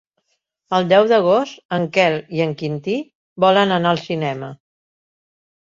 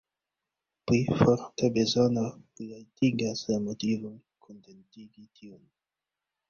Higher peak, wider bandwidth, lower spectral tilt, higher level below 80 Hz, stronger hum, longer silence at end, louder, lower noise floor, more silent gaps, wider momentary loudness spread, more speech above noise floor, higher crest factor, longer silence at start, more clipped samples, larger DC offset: first, -2 dBFS vs -6 dBFS; about the same, 7.6 kHz vs 7.4 kHz; about the same, -6 dB/octave vs -6 dB/octave; about the same, -62 dBFS vs -60 dBFS; neither; first, 1.1 s vs 0.95 s; first, -18 LUFS vs -27 LUFS; second, -71 dBFS vs -89 dBFS; first, 1.65-1.69 s, 3.15-3.36 s vs none; second, 11 LU vs 19 LU; second, 54 dB vs 61 dB; second, 18 dB vs 24 dB; second, 0.7 s vs 0.85 s; neither; neither